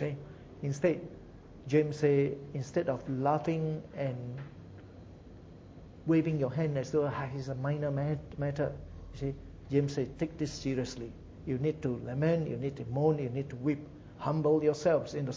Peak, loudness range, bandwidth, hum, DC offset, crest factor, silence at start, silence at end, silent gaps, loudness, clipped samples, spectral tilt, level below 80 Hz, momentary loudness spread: -14 dBFS; 4 LU; 7.8 kHz; none; under 0.1%; 20 dB; 0 s; 0 s; none; -33 LUFS; under 0.1%; -7.5 dB/octave; -56 dBFS; 21 LU